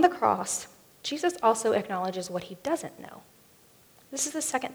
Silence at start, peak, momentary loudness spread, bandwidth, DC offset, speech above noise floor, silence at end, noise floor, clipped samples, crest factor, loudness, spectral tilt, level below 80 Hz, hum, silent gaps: 0 s; -6 dBFS; 15 LU; over 20 kHz; under 0.1%; 30 dB; 0 s; -58 dBFS; under 0.1%; 24 dB; -29 LUFS; -3 dB/octave; -72 dBFS; none; none